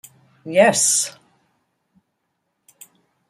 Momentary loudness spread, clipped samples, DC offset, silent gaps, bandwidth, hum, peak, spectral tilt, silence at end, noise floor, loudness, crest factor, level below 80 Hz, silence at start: 15 LU; under 0.1%; under 0.1%; none; 15.5 kHz; none; -2 dBFS; -2 dB/octave; 2.2 s; -74 dBFS; -16 LUFS; 20 dB; -72 dBFS; 0.45 s